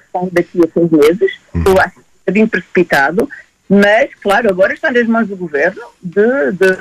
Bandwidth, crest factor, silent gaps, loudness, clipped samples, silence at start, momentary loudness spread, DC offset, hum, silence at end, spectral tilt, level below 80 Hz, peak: 14 kHz; 12 dB; none; -13 LUFS; under 0.1%; 0.15 s; 7 LU; under 0.1%; none; 0 s; -6.5 dB/octave; -38 dBFS; -2 dBFS